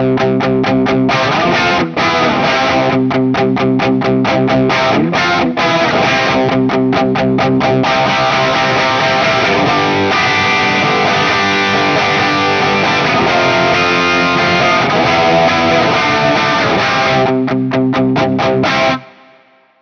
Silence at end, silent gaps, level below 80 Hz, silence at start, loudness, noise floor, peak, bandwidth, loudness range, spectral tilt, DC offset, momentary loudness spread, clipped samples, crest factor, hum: 0.75 s; none; -44 dBFS; 0 s; -11 LUFS; -47 dBFS; 0 dBFS; 7.2 kHz; 2 LU; -5 dB/octave; under 0.1%; 2 LU; under 0.1%; 12 dB; none